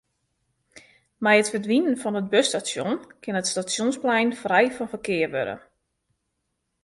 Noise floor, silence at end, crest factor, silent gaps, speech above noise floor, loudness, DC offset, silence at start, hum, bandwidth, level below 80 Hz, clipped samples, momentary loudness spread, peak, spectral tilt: -77 dBFS; 1.25 s; 22 dB; none; 54 dB; -23 LUFS; under 0.1%; 0.75 s; none; 11.5 kHz; -68 dBFS; under 0.1%; 10 LU; -4 dBFS; -3.5 dB/octave